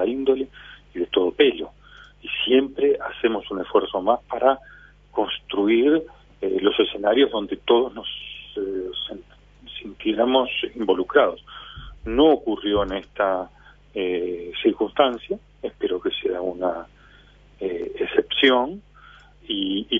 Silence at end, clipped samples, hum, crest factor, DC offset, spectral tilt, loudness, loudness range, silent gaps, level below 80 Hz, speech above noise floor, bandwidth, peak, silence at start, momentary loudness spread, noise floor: 0 s; under 0.1%; 50 Hz at -55 dBFS; 22 dB; under 0.1%; -6.5 dB/octave; -22 LUFS; 4 LU; none; -50 dBFS; 30 dB; 3.8 kHz; 0 dBFS; 0 s; 16 LU; -51 dBFS